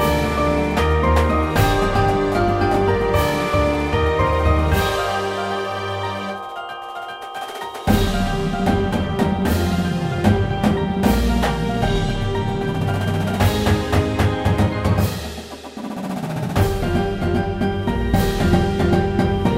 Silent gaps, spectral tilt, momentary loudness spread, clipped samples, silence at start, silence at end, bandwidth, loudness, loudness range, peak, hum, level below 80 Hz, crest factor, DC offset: none; -6.5 dB/octave; 10 LU; under 0.1%; 0 s; 0 s; 16.5 kHz; -20 LUFS; 5 LU; -4 dBFS; none; -28 dBFS; 16 dB; under 0.1%